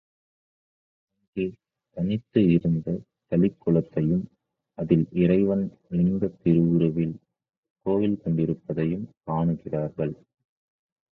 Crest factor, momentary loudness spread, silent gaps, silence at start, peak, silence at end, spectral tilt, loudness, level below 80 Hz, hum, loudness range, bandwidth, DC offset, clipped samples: 20 dB; 12 LU; 7.57-7.63 s, 7.70-7.76 s; 1.35 s; -6 dBFS; 1 s; -11.5 dB/octave; -25 LUFS; -52 dBFS; none; 4 LU; 4.1 kHz; under 0.1%; under 0.1%